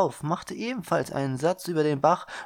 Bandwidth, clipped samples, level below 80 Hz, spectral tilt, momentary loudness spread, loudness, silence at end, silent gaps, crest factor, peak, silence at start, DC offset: 17.5 kHz; under 0.1%; -64 dBFS; -6 dB/octave; 8 LU; -27 LUFS; 0 s; none; 20 dB; -8 dBFS; 0 s; under 0.1%